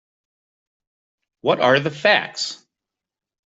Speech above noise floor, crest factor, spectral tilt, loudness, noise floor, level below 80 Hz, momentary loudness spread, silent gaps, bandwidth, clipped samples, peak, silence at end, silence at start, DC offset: 67 dB; 20 dB; -4 dB/octave; -19 LUFS; -86 dBFS; -68 dBFS; 11 LU; none; 8.2 kHz; under 0.1%; -2 dBFS; 0.95 s; 1.45 s; under 0.1%